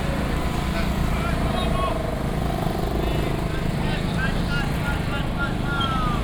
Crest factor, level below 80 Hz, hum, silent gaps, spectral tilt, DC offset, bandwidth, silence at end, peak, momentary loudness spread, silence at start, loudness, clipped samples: 14 dB; -28 dBFS; none; none; -6 dB/octave; under 0.1%; over 20 kHz; 0 s; -8 dBFS; 2 LU; 0 s; -25 LUFS; under 0.1%